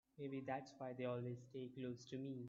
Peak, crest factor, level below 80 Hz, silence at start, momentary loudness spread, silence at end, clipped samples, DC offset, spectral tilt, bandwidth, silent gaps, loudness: -32 dBFS; 18 dB; -86 dBFS; 0.15 s; 6 LU; 0 s; under 0.1%; under 0.1%; -6.5 dB/octave; 7.6 kHz; none; -49 LUFS